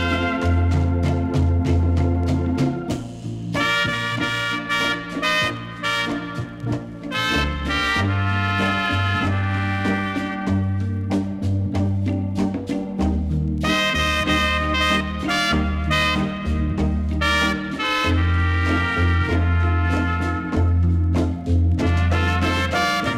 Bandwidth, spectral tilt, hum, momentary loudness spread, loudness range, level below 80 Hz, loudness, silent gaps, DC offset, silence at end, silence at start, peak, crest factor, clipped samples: 13 kHz; -5.5 dB/octave; none; 5 LU; 3 LU; -30 dBFS; -21 LUFS; none; under 0.1%; 0 s; 0 s; -6 dBFS; 14 dB; under 0.1%